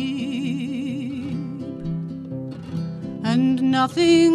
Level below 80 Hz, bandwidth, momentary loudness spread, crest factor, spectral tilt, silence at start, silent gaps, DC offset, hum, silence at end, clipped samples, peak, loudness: -54 dBFS; 11 kHz; 13 LU; 16 dB; -6 dB/octave; 0 s; none; under 0.1%; none; 0 s; under 0.1%; -6 dBFS; -24 LUFS